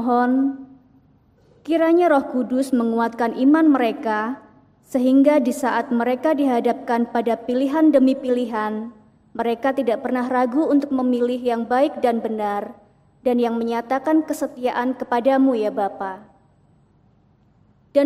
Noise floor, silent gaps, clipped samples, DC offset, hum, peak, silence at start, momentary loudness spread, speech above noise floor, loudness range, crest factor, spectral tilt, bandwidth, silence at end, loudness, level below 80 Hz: -57 dBFS; none; under 0.1%; under 0.1%; none; -4 dBFS; 0 s; 11 LU; 38 dB; 3 LU; 16 dB; -5.5 dB/octave; 14 kHz; 0 s; -20 LUFS; -64 dBFS